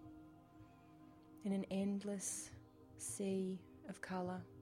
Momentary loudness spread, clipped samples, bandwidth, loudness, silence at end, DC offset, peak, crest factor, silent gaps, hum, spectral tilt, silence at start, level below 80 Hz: 22 LU; under 0.1%; 16 kHz; -44 LUFS; 0 s; under 0.1%; -32 dBFS; 14 dB; none; none; -5 dB/octave; 0 s; -74 dBFS